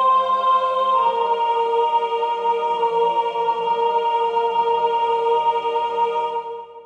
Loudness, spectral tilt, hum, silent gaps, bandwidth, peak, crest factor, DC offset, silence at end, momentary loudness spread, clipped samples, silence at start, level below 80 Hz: -20 LUFS; -3.5 dB/octave; none; none; 8.4 kHz; -8 dBFS; 10 dB; under 0.1%; 0 s; 4 LU; under 0.1%; 0 s; -70 dBFS